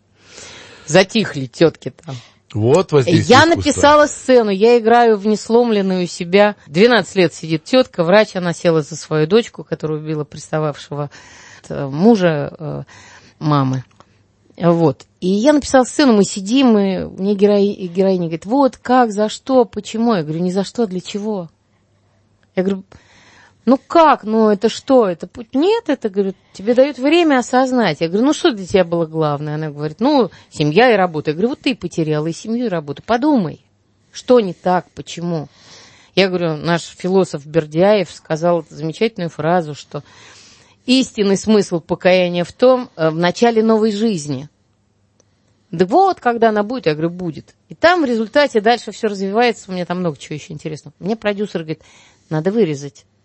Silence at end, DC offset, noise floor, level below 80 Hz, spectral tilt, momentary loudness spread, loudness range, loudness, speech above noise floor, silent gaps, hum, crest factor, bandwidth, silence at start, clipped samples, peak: 0.35 s; under 0.1%; -60 dBFS; -52 dBFS; -5.5 dB/octave; 14 LU; 6 LU; -16 LUFS; 44 dB; none; none; 16 dB; 8.8 kHz; 0.35 s; under 0.1%; 0 dBFS